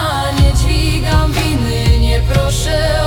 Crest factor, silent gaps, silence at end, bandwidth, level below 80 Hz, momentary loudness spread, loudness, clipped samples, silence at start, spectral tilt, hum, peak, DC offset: 12 dB; none; 0 s; 18 kHz; -16 dBFS; 2 LU; -14 LUFS; under 0.1%; 0 s; -5 dB/octave; none; -2 dBFS; under 0.1%